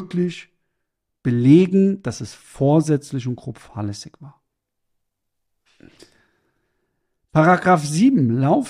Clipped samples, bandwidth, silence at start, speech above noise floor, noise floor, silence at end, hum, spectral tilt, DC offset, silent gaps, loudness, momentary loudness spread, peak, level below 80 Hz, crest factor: under 0.1%; 12.5 kHz; 0 s; 59 dB; -77 dBFS; 0 s; none; -7 dB/octave; under 0.1%; none; -18 LUFS; 18 LU; -2 dBFS; -58 dBFS; 18 dB